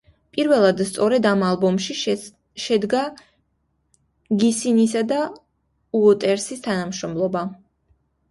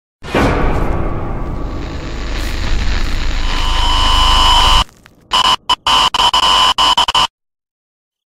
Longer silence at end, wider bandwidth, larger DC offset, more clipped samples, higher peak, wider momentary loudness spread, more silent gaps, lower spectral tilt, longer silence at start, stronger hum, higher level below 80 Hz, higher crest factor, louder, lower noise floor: second, 0.75 s vs 1 s; second, 11.5 kHz vs 15 kHz; neither; neither; second, -4 dBFS vs 0 dBFS; second, 11 LU vs 15 LU; neither; first, -5 dB/octave vs -3 dB/octave; first, 0.35 s vs 0.2 s; neither; second, -60 dBFS vs -18 dBFS; about the same, 18 dB vs 14 dB; second, -21 LUFS vs -13 LUFS; first, -69 dBFS vs -38 dBFS